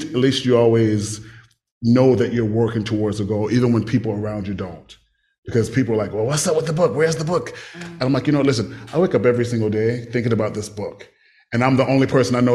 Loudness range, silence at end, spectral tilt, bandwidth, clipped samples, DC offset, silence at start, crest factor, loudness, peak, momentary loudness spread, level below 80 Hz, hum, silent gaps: 3 LU; 0 s; -6 dB/octave; 13 kHz; under 0.1%; under 0.1%; 0 s; 18 dB; -19 LUFS; -2 dBFS; 12 LU; -50 dBFS; none; 1.72-1.81 s, 5.38-5.43 s